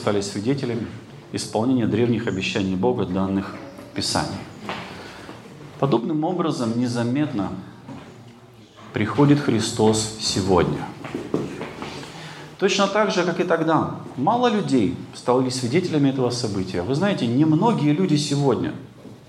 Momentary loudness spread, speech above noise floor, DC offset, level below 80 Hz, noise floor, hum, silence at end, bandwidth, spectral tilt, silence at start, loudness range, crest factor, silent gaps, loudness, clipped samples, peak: 16 LU; 25 dB; under 0.1%; -56 dBFS; -46 dBFS; none; 0.05 s; 13 kHz; -5.5 dB/octave; 0 s; 5 LU; 18 dB; none; -22 LUFS; under 0.1%; -4 dBFS